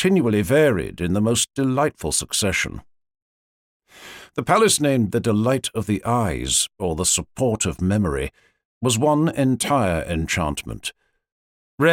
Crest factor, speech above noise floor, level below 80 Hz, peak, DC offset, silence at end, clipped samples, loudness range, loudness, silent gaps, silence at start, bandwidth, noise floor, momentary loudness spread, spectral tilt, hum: 18 dB; 22 dB; -42 dBFS; -4 dBFS; under 0.1%; 0 s; under 0.1%; 3 LU; -21 LUFS; 3.22-3.80 s, 8.65-8.81 s, 11.32-11.78 s; 0 s; 17 kHz; -43 dBFS; 11 LU; -4 dB/octave; none